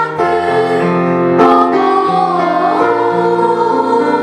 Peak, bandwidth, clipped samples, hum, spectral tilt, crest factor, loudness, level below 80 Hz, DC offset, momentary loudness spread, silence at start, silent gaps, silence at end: 0 dBFS; 10.5 kHz; under 0.1%; none; -7 dB/octave; 12 dB; -12 LUFS; -54 dBFS; under 0.1%; 4 LU; 0 s; none; 0 s